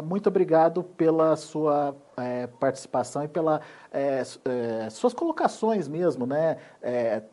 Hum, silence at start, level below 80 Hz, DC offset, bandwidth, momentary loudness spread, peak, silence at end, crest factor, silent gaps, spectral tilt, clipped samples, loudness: none; 0 s; -74 dBFS; under 0.1%; 11.5 kHz; 9 LU; -8 dBFS; 0.05 s; 18 dB; none; -6.5 dB/octave; under 0.1%; -26 LUFS